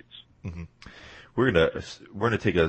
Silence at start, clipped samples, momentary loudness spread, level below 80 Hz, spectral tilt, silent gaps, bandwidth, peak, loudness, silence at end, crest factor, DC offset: 0.15 s; under 0.1%; 23 LU; -48 dBFS; -6.5 dB/octave; none; 8.6 kHz; -8 dBFS; -25 LUFS; 0 s; 20 dB; under 0.1%